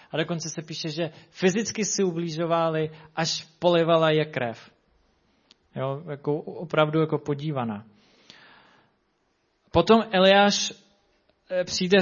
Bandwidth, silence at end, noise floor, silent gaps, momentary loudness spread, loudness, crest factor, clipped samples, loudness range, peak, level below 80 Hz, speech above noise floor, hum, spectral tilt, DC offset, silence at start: 7.4 kHz; 0 s; -71 dBFS; none; 13 LU; -24 LUFS; 20 dB; under 0.1%; 6 LU; -4 dBFS; -58 dBFS; 47 dB; none; -4.5 dB/octave; under 0.1%; 0.15 s